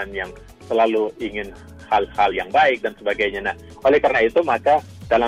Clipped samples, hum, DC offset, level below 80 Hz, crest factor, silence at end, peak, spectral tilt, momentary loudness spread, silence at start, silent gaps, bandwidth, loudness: under 0.1%; none; under 0.1%; -46 dBFS; 14 dB; 0 s; -6 dBFS; -5.5 dB/octave; 11 LU; 0 s; none; 13 kHz; -20 LUFS